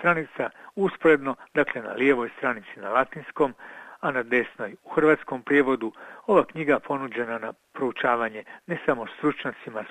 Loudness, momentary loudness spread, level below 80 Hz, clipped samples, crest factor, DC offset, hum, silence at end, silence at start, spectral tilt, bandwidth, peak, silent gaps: -25 LUFS; 12 LU; -64 dBFS; under 0.1%; 20 dB; under 0.1%; none; 0 s; 0 s; -7 dB/octave; 9.2 kHz; -6 dBFS; none